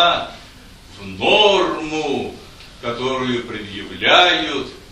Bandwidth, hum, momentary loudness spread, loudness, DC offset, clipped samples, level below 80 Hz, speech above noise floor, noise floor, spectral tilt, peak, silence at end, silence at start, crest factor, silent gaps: 12.5 kHz; none; 19 LU; -17 LUFS; under 0.1%; under 0.1%; -46 dBFS; 23 dB; -41 dBFS; -3.5 dB/octave; 0 dBFS; 0 s; 0 s; 18 dB; none